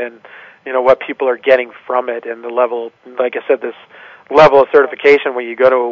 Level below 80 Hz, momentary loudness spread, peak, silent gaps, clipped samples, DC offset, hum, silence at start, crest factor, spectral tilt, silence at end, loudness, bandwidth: -52 dBFS; 15 LU; 0 dBFS; none; under 0.1%; under 0.1%; none; 0 s; 14 dB; -6 dB/octave; 0 s; -13 LUFS; 7 kHz